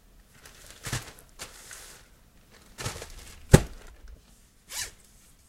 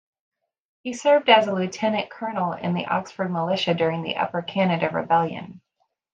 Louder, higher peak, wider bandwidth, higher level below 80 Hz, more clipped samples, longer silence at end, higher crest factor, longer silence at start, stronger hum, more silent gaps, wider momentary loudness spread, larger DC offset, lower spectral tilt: second, -28 LUFS vs -23 LUFS; about the same, 0 dBFS vs -2 dBFS; first, 16.5 kHz vs 8.8 kHz; first, -40 dBFS vs -70 dBFS; neither; about the same, 0.6 s vs 0.55 s; first, 32 dB vs 22 dB; about the same, 0.85 s vs 0.85 s; neither; neither; first, 29 LU vs 12 LU; neither; about the same, -5 dB/octave vs -5.5 dB/octave